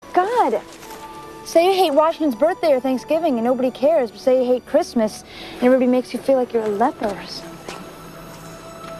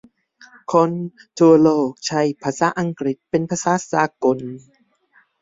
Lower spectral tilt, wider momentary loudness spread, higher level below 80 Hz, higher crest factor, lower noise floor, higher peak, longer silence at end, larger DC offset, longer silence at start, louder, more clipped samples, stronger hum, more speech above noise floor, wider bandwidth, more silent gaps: about the same, -5 dB/octave vs -5.5 dB/octave; first, 20 LU vs 15 LU; first, -54 dBFS vs -62 dBFS; about the same, 16 dB vs 18 dB; second, -37 dBFS vs -58 dBFS; about the same, -4 dBFS vs -2 dBFS; second, 0 s vs 0.85 s; neither; second, 0.05 s vs 0.7 s; about the same, -19 LUFS vs -19 LUFS; neither; neither; second, 19 dB vs 40 dB; first, 13.5 kHz vs 7.8 kHz; neither